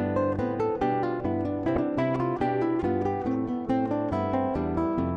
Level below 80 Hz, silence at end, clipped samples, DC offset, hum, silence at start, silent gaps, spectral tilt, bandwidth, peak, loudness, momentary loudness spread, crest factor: -48 dBFS; 0 s; under 0.1%; under 0.1%; none; 0 s; none; -9.5 dB/octave; 7.4 kHz; -14 dBFS; -27 LUFS; 2 LU; 12 dB